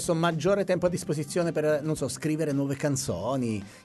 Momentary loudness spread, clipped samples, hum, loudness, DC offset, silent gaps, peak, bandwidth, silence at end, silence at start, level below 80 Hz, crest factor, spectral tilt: 5 LU; under 0.1%; none; -28 LUFS; under 0.1%; none; -12 dBFS; 12 kHz; 0.05 s; 0 s; -56 dBFS; 16 dB; -5.5 dB/octave